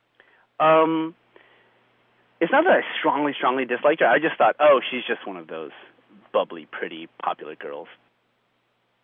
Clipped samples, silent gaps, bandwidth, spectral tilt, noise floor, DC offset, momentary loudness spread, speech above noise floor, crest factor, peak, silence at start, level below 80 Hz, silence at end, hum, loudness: under 0.1%; none; 3.8 kHz; -8 dB/octave; -69 dBFS; under 0.1%; 17 LU; 47 dB; 18 dB; -6 dBFS; 0.6 s; -88 dBFS; 1.2 s; none; -21 LUFS